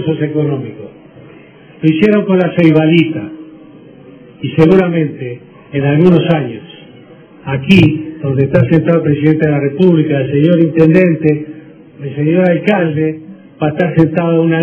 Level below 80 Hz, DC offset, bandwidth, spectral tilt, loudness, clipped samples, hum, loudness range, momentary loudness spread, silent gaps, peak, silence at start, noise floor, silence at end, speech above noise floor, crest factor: -46 dBFS; under 0.1%; 6.2 kHz; -9 dB/octave; -11 LUFS; 0.8%; none; 3 LU; 16 LU; none; 0 dBFS; 0 s; -38 dBFS; 0 s; 28 dB; 12 dB